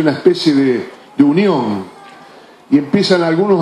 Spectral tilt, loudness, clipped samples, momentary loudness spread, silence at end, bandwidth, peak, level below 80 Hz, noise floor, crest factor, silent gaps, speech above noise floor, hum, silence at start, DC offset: -6.5 dB/octave; -14 LUFS; under 0.1%; 10 LU; 0 s; 11 kHz; 0 dBFS; -60 dBFS; -40 dBFS; 14 dB; none; 28 dB; none; 0 s; under 0.1%